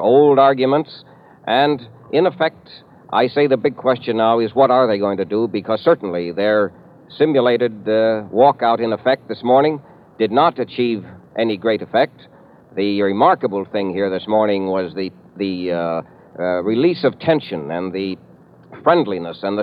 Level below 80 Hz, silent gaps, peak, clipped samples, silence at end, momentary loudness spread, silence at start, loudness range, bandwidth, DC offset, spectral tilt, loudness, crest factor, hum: -64 dBFS; none; 0 dBFS; under 0.1%; 0 s; 10 LU; 0 s; 4 LU; 5.2 kHz; under 0.1%; -8.5 dB/octave; -18 LUFS; 16 dB; none